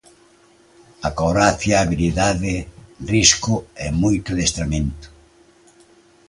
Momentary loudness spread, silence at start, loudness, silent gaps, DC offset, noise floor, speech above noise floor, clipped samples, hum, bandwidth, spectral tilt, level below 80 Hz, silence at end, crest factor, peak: 14 LU; 1 s; -19 LUFS; none; under 0.1%; -53 dBFS; 34 dB; under 0.1%; none; 11.5 kHz; -4 dB/octave; -34 dBFS; 1.2 s; 20 dB; 0 dBFS